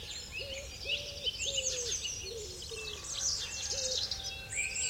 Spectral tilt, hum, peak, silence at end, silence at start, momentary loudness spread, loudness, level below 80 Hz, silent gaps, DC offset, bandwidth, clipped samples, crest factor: 0 dB/octave; none; -22 dBFS; 0 s; 0 s; 8 LU; -35 LUFS; -54 dBFS; none; under 0.1%; 16.5 kHz; under 0.1%; 16 dB